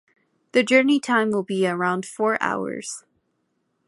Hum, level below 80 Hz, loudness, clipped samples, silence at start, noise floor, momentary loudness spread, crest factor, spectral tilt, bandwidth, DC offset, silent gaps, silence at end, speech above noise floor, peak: none; -72 dBFS; -22 LUFS; under 0.1%; 0.55 s; -72 dBFS; 13 LU; 20 dB; -4.5 dB/octave; 11.5 kHz; under 0.1%; none; 0.9 s; 51 dB; -4 dBFS